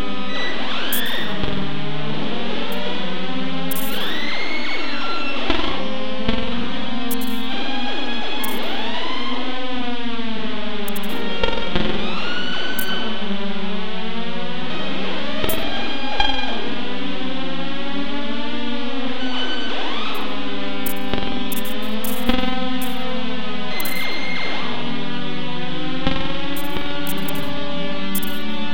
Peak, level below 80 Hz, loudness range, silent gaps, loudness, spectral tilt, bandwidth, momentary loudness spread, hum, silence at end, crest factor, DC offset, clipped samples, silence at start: -2 dBFS; -40 dBFS; 1 LU; none; -25 LUFS; -4 dB/octave; 17 kHz; 4 LU; none; 0 s; 24 dB; 20%; under 0.1%; 0 s